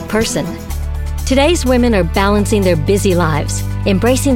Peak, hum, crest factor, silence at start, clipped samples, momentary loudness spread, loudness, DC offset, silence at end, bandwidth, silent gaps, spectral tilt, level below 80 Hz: 0 dBFS; none; 12 dB; 0 s; under 0.1%; 10 LU; -14 LUFS; under 0.1%; 0 s; 17 kHz; none; -5.5 dB/octave; -22 dBFS